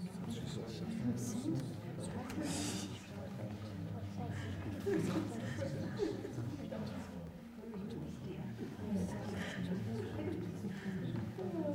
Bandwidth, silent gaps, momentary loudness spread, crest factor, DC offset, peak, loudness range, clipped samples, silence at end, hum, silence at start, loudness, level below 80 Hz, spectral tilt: 16 kHz; none; 7 LU; 16 dB; under 0.1%; -26 dBFS; 3 LU; under 0.1%; 0 s; none; 0 s; -42 LUFS; -66 dBFS; -6 dB/octave